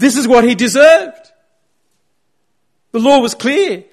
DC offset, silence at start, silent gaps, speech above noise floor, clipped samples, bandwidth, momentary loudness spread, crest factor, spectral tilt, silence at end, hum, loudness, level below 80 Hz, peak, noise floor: under 0.1%; 0 s; none; 58 dB; under 0.1%; 13.5 kHz; 8 LU; 12 dB; -3.5 dB/octave; 0.1 s; none; -11 LUFS; -50 dBFS; 0 dBFS; -68 dBFS